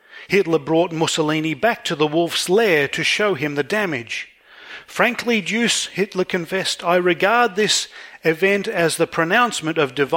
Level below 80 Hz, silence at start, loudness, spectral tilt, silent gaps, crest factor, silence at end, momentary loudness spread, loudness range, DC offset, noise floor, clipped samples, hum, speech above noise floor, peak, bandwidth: -62 dBFS; 0.15 s; -19 LUFS; -3.5 dB/octave; none; 20 dB; 0 s; 6 LU; 3 LU; under 0.1%; -40 dBFS; under 0.1%; none; 21 dB; 0 dBFS; 17 kHz